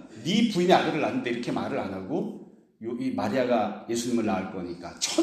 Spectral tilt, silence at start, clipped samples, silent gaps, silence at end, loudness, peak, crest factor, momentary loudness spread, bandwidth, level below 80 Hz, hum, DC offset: -4.5 dB/octave; 0 s; under 0.1%; none; 0 s; -27 LUFS; -4 dBFS; 22 dB; 14 LU; 14 kHz; -66 dBFS; none; under 0.1%